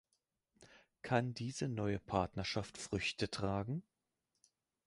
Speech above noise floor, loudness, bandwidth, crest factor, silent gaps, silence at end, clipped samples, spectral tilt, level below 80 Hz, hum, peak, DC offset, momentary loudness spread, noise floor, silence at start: 48 dB; -40 LUFS; 11.5 kHz; 22 dB; none; 1.05 s; under 0.1%; -5.5 dB/octave; -60 dBFS; none; -18 dBFS; under 0.1%; 6 LU; -87 dBFS; 0.6 s